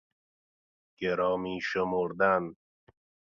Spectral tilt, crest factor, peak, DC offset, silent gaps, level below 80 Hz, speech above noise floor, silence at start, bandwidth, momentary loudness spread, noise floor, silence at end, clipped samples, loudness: -6 dB/octave; 20 dB; -10 dBFS; under 0.1%; none; -64 dBFS; over 61 dB; 1 s; 7.2 kHz; 7 LU; under -90 dBFS; 0.7 s; under 0.1%; -29 LUFS